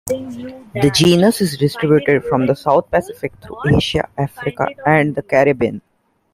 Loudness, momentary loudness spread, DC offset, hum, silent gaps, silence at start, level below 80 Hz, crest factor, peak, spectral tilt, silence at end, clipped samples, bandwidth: -16 LUFS; 15 LU; under 0.1%; none; none; 0.05 s; -42 dBFS; 16 dB; 0 dBFS; -5.5 dB/octave; 0.55 s; under 0.1%; 16 kHz